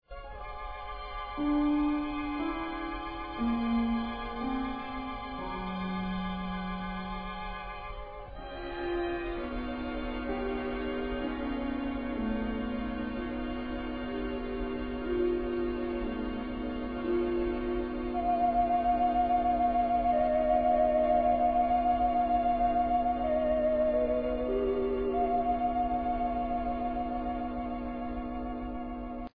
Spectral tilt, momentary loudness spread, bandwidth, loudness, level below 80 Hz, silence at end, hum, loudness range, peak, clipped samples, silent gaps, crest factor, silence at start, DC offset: -9.5 dB/octave; 11 LU; 5 kHz; -31 LUFS; -44 dBFS; 0 s; none; 10 LU; -16 dBFS; under 0.1%; none; 14 dB; 0.1 s; 0.2%